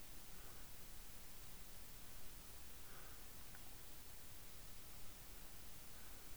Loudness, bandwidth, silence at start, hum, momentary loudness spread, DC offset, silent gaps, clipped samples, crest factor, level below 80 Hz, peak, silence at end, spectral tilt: -55 LUFS; over 20 kHz; 0 s; none; 0 LU; 0.2%; none; under 0.1%; 16 dB; -62 dBFS; -38 dBFS; 0 s; -2.5 dB/octave